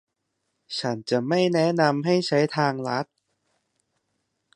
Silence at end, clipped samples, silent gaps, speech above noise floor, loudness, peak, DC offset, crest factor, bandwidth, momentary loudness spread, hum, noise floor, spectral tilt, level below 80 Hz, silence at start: 1.5 s; under 0.1%; none; 55 dB; -24 LUFS; -4 dBFS; under 0.1%; 20 dB; 11 kHz; 9 LU; none; -78 dBFS; -6 dB/octave; -72 dBFS; 0.7 s